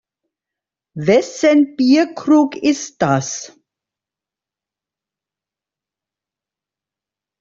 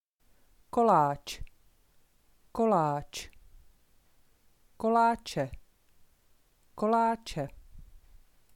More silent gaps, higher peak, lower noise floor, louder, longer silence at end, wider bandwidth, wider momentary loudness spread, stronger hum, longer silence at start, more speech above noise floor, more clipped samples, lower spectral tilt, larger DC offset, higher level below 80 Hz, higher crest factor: neither; first, -2 dBFS vs -12 dBFS; first, -88 dBFS vs -65 dBFS; first, -15 LUFS vs -29 LUFS; first, 3.95 s vs 0.4 s; second, 7.6 kHz vs 17 kHz; second, 10 LU vs 17 LU; neither; first, 0.95 s vs 0.75 s; first, 73 dB vs 37 dB; neither; about the same, -5 dB/octave vs -6 dB/octave; neither; about the same, -60 dBFS vs -56 dBFS; about the same, 16 dB vs 20 dB